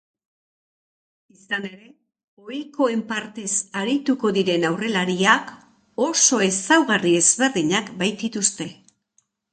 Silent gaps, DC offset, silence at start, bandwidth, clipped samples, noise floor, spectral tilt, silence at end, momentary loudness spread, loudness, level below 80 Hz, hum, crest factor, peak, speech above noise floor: 2.24-2.37 s; under 0.1%; 1.5 s; 9.4 kHz; under 0.1%; -67 dBFS; -2.5 dB/octave; 0.8 s; 16 LU; -20 LUFS; -68 dBFS; none; 20 dB; -2 dBFS; 46 dB